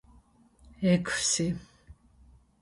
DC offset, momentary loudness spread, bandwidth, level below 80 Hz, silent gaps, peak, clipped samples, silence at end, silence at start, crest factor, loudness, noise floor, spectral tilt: under 0.1%; 7 LU; 11.5 kHz; -56 dBFS; none; -12 dBFS; under 0.1%; 0.7 s; 0.8 s; 20 dB; -28 LUFS; -60 dBFS; -4 dB/octave